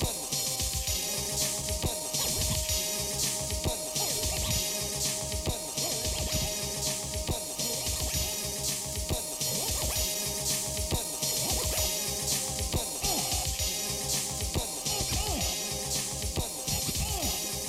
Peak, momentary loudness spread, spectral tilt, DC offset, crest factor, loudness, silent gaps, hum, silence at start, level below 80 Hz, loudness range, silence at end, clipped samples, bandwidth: -16 dBFS; 3 LU; -2 dB/octave; under 0.1%; 16 dB; -29 LUFS; none; none; 0 s; -40 dBFS; 2 LU; 0 s; under 0.1%; over 20 kHz